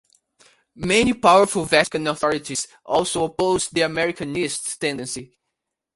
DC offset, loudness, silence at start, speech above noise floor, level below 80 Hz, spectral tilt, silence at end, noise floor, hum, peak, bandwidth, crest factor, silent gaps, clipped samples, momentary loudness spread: under 0.1%; -20 LUFS; 0.75 s; 60 dB; -52 dBFS; -3.5 dB/octave; 0.7 s; -81 dBFS; none; 0 dBFS; 11.5 kHz; 20 dB; none; under 0.1%; 12 LU